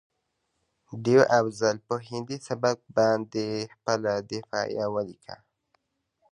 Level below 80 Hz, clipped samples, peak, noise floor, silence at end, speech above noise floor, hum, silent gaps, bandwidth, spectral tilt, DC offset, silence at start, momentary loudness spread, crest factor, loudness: -68 dBFS; under 0.1%; -6 dBFS; -78 dBFS; 0.95 s; 51 dB; none; none; 11 kHz; -5 dB/octave; under 0.1%; 0.9 s; 13 LU; 22 dB; -27 LUFS